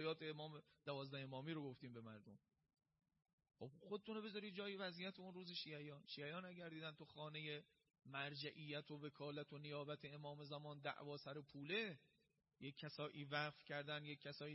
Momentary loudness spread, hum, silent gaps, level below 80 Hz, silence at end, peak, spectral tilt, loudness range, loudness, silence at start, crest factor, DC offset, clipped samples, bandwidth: 10 LU; none; 3.33-3.38 s; under -90 dBFS; 0 s; -30 dBFS; -3.5 dB/octave; 5 LU; -52 LUFS; 0 s; 22 dB; under 0.1%; under 0.1%; 5.6 kHz